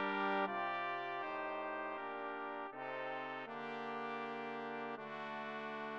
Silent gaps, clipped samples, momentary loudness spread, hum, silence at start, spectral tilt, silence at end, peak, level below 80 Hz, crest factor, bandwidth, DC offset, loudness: none; under 0.1%; 8 LU; none; 0 s; -6 dB/octave; 0 s; -22 dBFS; -90 dBFS; 20 dB; 8.4 kHz; under 0.1%; -42 LUFS